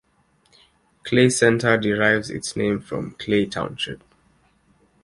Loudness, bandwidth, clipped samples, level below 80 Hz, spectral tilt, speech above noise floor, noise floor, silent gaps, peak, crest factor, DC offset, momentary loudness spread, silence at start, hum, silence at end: -21 LUFS; 11.5 kHz; under 0.1%; -54 dBFS; -4.5 dB/octave; 42 dB; -63 dBFS; none; -2 dBFS; 20 dB; under 0.1%; 13 LU; 1.05 s; none; 1.05 s